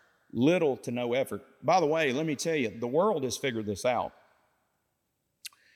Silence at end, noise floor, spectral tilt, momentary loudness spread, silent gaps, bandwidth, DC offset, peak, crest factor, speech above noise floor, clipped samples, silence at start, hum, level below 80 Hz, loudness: 0.3 s; -79 dBFS; -5 dB/octave; 13 LU; none; 16.5 kHz; under 0.1%; -12 dBFS; 18 dB; 51 dB; under 0.1%; 0.35 s; none; -74 dBFS; -29 LUFS